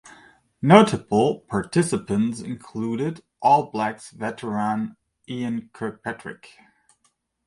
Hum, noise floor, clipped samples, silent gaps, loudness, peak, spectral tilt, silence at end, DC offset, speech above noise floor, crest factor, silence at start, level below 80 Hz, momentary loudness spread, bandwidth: none; -69 dBFS; under 0.1%; none; -23 LUFS; 0 dBFS; -6 dB/octave; 1.1 s; under 0.1%; 47 dB; 24 dB; 0.05 s; -58 dBFS; 18 LU; 11.5 kHz